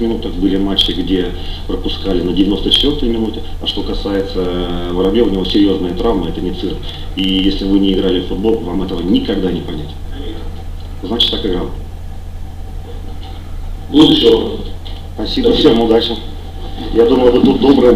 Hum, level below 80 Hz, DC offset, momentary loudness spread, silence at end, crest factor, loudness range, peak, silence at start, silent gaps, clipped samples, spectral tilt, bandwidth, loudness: none; -24 dBFS; under 0.1%; 19 LU; 0 s; 14 dB; 7 LU; 0 dBFS; 0 s; none; under 0.1%; -6.5 dB/octave; 15.5 kHz; -14 LUFS